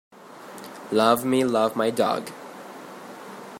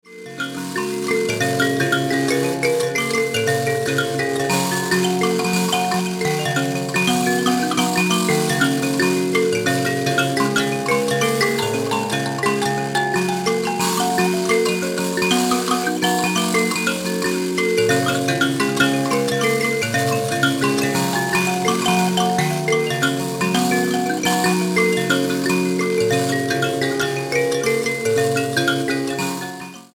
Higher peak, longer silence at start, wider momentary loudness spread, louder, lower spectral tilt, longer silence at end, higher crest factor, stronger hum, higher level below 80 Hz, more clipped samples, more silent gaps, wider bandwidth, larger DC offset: about the same, -6 dBFS vs -4 dBFS; first, 0.25 s vs 0.05 s; first, 20 LU vs 3 LU; second, -22 LUFS vs -19 LUFS; about the same, -4.5 dB/octave vs -4 dB/octave; about the same, 0 s vs 0.1 s; first, 20 dB vs 14 dB; neither; second, -72 dBFS vs -56 dBFS; neither; neither; second, 16 kHz vs 18.5 kHz; neither